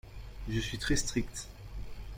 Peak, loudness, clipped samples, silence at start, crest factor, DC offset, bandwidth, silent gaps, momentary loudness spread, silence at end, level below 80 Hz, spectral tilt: -18 dBFS; -35 LUFS; under 0.1%; 0.05 s; 18 dB; under 0.1%; 16.5 kHz; none; 15 LU; 0 s; -42 dBFS; -4 dB/octave